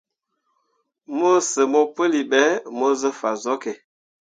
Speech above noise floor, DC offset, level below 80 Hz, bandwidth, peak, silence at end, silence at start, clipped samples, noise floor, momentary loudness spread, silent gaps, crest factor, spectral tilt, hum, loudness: 54 dB; under 0.1%; -76 dBFS; 9.6 kHz; -2 dBFS; 0.6 s; 1.1 s; under 0.1%; -74 dBFS; 9 LU; none; 20 dB; -2.5 dB/octave; none; -20 LUFS